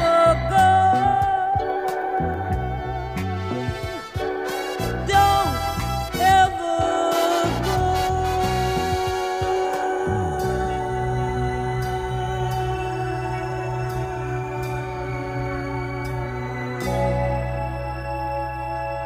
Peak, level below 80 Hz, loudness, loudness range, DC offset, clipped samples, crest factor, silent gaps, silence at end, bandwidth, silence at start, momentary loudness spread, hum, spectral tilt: -4 dBFS; -36 dBFS; -23 LUFS; 7 LU; 0.1%; under 0.1%; 18 dB; none; 0 s; 15.5 kHz; 0 s; 11 LU; none; -5.5 dB/octave